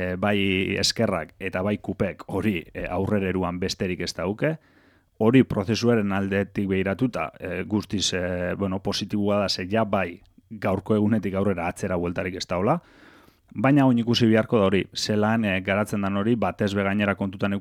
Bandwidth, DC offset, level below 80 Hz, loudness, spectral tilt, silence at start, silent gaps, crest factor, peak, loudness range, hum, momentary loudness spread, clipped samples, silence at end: 15.5 kHz; under 0.1%; -52 dBFS; -24 LUFS; -5.5 dB/octave; 0 s; none; 18 dB; -6 dBFS; 4 LU; none; 8 LU; under 0.1%; 0 s